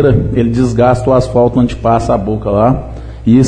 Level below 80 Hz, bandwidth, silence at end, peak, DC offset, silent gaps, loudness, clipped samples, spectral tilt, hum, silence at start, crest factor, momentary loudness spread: -26 dBFS; 9.8 kHz; 0 s; 0 dBFS; under 0.1%; none; -12 LUFS; under 0.1%; -8.5 dB/octave; none; 0 s; 10 dB; 4 LU